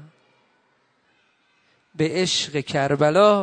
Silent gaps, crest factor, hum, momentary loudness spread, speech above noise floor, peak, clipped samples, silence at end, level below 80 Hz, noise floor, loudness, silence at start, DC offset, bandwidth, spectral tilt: none; 20 dB; none; 9 LU; 45 dB; -2 dBFS; under 0.1%; 0 s; -62 dBFS; -65 dBFS; -20 LUFS; 0 s; under 0.1%; 9.6 kHz; -4.5 dB/octave